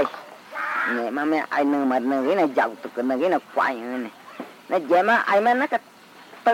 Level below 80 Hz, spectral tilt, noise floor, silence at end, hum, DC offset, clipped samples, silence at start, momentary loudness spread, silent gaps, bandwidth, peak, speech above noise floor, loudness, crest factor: -84 dBFS; -5 dB/octave; -46 dBFS; 0 s; none; under 0.1%; under 0.1%; 0 s; 14 LU; none; 16.5 kHz; -8 dBFS; 24 dB; -22 LUFS; 14 dB